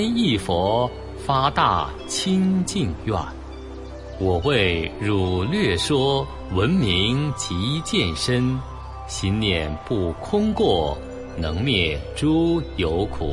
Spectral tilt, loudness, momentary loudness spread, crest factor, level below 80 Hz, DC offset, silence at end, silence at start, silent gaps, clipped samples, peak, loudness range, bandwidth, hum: -5.5 dB/octave; -22 LUFS; 10 LU; 18 dB; -38 dBFS; under 0.1%; 0 s; 0 s; none; under 0.1%; -4 dBFS; 2 LU; 11.5 kHz; none